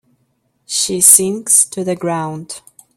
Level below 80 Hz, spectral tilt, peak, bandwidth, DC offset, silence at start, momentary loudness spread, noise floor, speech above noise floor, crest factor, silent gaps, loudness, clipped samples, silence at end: -60 dBFS; -2.5 dB/octave; 0 dBFS; over 20 kHz; under 0.1%; 0.7 s; 21 LU; -64 dBFS; 49 dB; 16 dB; none; -11 LUFS; 0.3%; 0.4 s